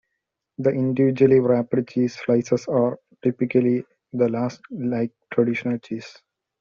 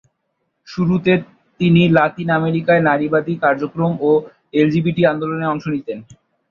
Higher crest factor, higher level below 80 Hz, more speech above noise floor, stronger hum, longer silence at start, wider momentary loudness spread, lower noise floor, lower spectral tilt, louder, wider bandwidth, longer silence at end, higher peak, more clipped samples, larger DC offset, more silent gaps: about the same, 18 dB vs 16 dB; second, -62 dBFS vs -54 dBFS; first, 59 dB vs 55 dB; neither; about the same, 0.6 s vs 0.7 s; about the same, 11 LU vs 9 LU; first, -80 dBFS vs -71 dBFS; about the same, -8 dB/octave vs -8.5 dB/octave; second, -22 LUFS vs -17 LUFS; about the same, 7.2 kHz vs 6.8 kHz; first, 0.5 s vs 0.35 s; about the same, -4 dBFS vs -2 dBFS; neither; neither; neither